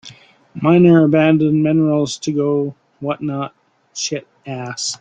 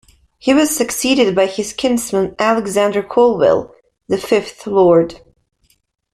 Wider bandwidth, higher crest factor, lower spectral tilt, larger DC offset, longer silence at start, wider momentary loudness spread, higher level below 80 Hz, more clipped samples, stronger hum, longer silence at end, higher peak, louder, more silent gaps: second, 9.2 kHz vs 15.5 kHz; about the same, 14 dB vs 14 dB; first, -6 dB/octave vs -4 dB/octave; neither; second, 0.05 s vs 0.45 s; first, 17 LU vs 7 LU; second, -58 dBFS vs -50 dBFS; neither; neither; second, 0.05 s vs 0.95 s; about the same, -2 dBFS vs -2 dBFS; about the same, -16 LUFS vs -15 LUFS; neither